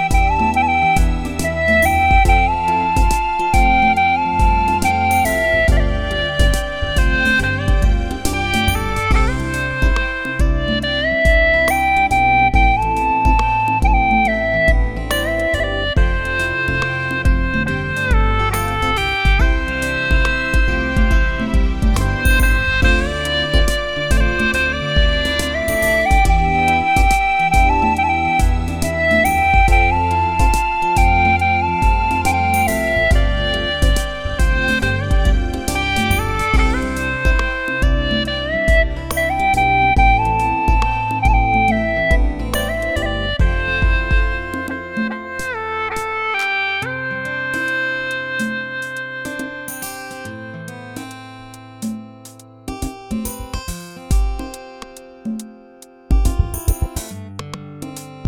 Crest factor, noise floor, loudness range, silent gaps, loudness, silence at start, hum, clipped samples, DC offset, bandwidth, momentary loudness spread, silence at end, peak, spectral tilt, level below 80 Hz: 16 dB; -43 dBFS; 10 LU; none; -17 LUFS; 0 s; none; under 0.1%; under 0.1%; 17.5 kHz; 13 LU; 0 s; 0 dBFS; -5 dB/octave; -20 dBFS